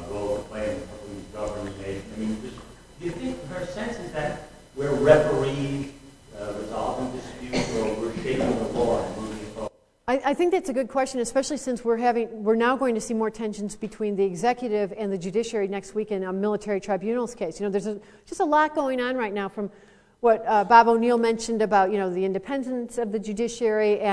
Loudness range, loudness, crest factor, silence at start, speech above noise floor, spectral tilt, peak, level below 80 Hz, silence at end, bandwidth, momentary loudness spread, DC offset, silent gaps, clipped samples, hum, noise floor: 8 LU; -25 LUFS; 22 dB; 0 s; 21 dB; -5.5 dB/octave; -2 dBFS; -50 dBFS; 0 s; 11 kHz; 14 LU; under 0.1%; none; under 0.1%; none; -45 dBFS